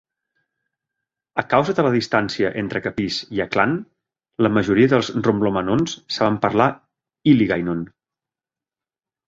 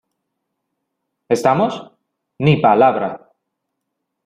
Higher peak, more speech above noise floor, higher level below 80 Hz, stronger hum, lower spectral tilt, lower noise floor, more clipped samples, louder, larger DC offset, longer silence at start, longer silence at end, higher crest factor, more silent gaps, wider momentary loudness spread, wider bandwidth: about the same, -2 dBFS vs -2 dBFS; first, over 71 dB vs 62 dB; about the same, -52 dBFS vs -56 dBFS; neither; about the same, -6 dB/octave vs -7 dB/octave; first, under -90 dBFS vs -77 dBFS; neither; second, -20 LUFS vs -16 LUFS; neither; about the same, 1.35 s vs 1.3 s; first, 1.4 s vs 1.1 s; about the same, 20 dB vs 18 dB; neither; second, 9 LU vs 15 LU; second, 7.8 kHz vs 13 kHz